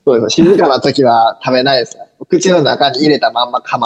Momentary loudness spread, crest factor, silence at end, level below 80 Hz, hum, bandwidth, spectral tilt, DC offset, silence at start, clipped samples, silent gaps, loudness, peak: 6 LU; 10 dB; 0 s; -52 dBFS; none; 9 kHz; -4.5 dB/octave; under 0.1%; 0.05 s; under 0.1%; none; -11 LUFS; 0 dBFS